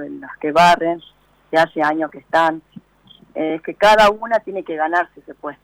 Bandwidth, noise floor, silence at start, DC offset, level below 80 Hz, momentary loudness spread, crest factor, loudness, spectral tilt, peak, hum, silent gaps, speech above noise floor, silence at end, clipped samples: 16.5 kHz; -50 dBFS; 0 s; under 0.1%; -50 dBFS; 17 LU; 12 dB; -17 LUFS; -4.5 dB/octave; -6 dBFS; none; none; 32 dB; 0.1 s; under 0.1%